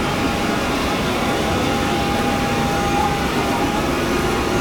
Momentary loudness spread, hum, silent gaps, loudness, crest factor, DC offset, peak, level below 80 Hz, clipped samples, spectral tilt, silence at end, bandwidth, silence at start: 1 LU; none; none; -19 LUFS; 12 dB; 0.3%; -6 dBFS; -32 dBFS; under 0.1%; -4.5 dB/octave; 0 s; over 20 kHz; 0 s